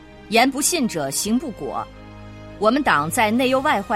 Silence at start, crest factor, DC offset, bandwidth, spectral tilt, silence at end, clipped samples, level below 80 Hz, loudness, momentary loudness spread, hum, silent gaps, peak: 0 s; 18 dB; under 0.1%; 16.5 kHz; -3 dB/octave; 0 s; under 0.1%; -48 dBFS; -20 LUFS; 16 LU; none; none; -4 dBFS